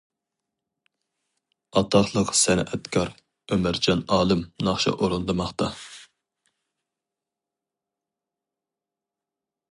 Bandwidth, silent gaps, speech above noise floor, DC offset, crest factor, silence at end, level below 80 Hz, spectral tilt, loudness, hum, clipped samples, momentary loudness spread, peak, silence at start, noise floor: 11.5 kHz; none; 65 dB; under 0.1%; 24 dB; 3.65 s; -50 dBFS; -4 dB/octave; -23 LUFS; none; under 0.1%; 9 LU; -4 dBFS; 1.75 s; -88 dBFS